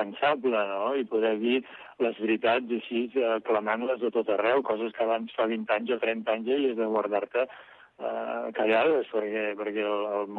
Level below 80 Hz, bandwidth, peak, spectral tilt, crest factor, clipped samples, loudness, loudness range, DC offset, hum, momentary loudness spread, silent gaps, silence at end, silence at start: -78 dBFS; 4.6 kHz; -12 dBFS; -7.5 dB/octave; 14 dB; under 0.1%; -28 LUFS; 1 LU; under 0.1%; none; 6 LU; none; 0 s; 0 s